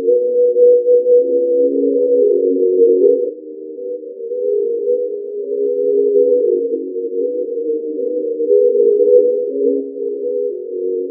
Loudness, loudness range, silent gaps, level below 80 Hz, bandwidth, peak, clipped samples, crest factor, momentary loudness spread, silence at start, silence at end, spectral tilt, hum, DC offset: -15 LUFS; 5 LU; none; under -90 dBFS; 0.7 kHz; 0 dBFS; under 0.1%; 14 dB; 12 LU; 0 s; 0 s; -13.5 dB/octave; none; under 0.1%